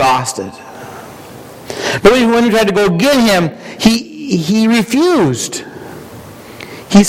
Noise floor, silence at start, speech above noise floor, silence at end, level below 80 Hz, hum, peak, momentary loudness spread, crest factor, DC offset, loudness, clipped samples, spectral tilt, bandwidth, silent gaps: -33 dBFS; 0 s; 21 dB; 0 s; -40 dBFS; none; 0 dBFS; 22 LU; 14 dB; under 0.1%; -12 LUFS; 0.2%; -4.5 dB/octave; 16.5 kHz; none